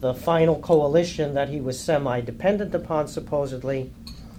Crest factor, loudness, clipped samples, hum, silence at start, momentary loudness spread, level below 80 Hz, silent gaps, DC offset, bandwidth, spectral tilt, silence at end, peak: 16 dB; -24 LUFS; under 0.1%; none; 0 s; 10 LU; -46 dBFS; none; under 0.1%; 16 kHz; -6.5 dB/octave; 0 s; -8 dBFS